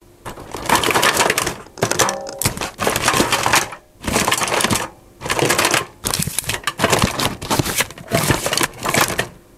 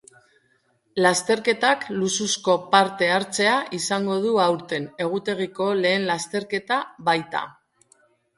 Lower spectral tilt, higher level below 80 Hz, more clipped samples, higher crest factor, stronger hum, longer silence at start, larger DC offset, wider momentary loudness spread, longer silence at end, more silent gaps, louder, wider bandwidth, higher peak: about the same, -2.5 dB/octave vs -3 dB/octave; first, -40 dBFS vs -68 dBFS; neither; about the same, 20 dB vs 22 dB; neither; second, 0.25 s vs 0.95 s; neither; about the same, 10 LU vs 8 LU; second, 0.2 s vs 0.85 s; neither; first, -18 LUFS vs -22 LUFS; first, 16.5 kHz vs 11.5 kHz; about the same, 0 dBFS vs -2 dBFS